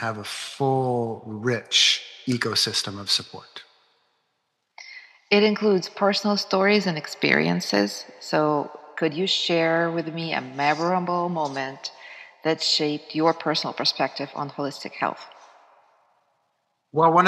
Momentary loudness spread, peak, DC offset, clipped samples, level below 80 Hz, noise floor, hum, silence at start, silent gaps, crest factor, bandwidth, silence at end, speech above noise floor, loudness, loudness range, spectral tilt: 14 LU; -2 dBFS; under 0.1%; under 0.1%; -80 dBFS; -75 dBFS; none; 0 s; none; 22 dB; 13.5 kHz; 0 s; 52 dB; -23 LUFS; 5 LU; -4 dB/octave